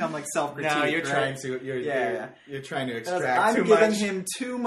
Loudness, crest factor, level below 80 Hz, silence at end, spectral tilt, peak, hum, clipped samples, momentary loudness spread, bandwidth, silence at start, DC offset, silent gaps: -25 LUFS; 20 dB; -68 dBFS; 0 s; -4 dB/octave; -6 dBFS; none; under 0.1%; 13 LU; 14 kHz; 0 s; under 0.1%; none